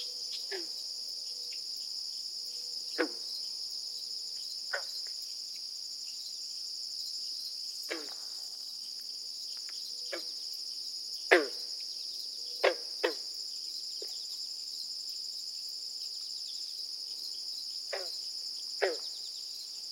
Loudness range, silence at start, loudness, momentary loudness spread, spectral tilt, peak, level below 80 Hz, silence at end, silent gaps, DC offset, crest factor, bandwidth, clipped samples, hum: 5 LU; 0 s; -36 LUFS; 5 LU; 1.5 dB/octave; -6 dBFS; under -90 dBFS; 0 s; none; under 0.1%; 32 dB; 16.5 kHz; under 0.1%; none